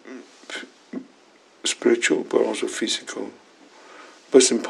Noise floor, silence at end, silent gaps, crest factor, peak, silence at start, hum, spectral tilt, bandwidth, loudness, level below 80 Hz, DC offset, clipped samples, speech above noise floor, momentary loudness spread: -54 dBFS; 0 s; none; 22 dB; -2 dBFS; 0.05 s; none; -2 dB/octave; 12 kHz; -22 LUFS; -84 dBFS; under 0.1%; under 0.1%; 34 dB; 20 LU